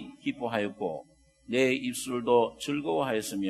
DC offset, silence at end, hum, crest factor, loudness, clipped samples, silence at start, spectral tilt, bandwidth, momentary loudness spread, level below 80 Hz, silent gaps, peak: under 0.1%; 0 s; none; 20 dB; -29 LUFS; under 0.1%; 0 s; -4.5 dB/octave; 13 kHz; 10 LU; -66 dBFS; none; -10 dBFS